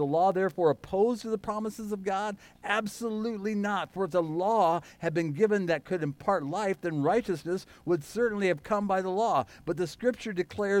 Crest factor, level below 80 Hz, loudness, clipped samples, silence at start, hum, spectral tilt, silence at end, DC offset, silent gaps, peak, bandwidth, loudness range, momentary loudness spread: 16 dB; -62 dBFS; -29 LUFS; under 0.1%; 0 s; none; -6 dB/octave; 0 s; under 0.1%; none; -12 dBFS; 16.5 kHz; 3 LU; 8 LU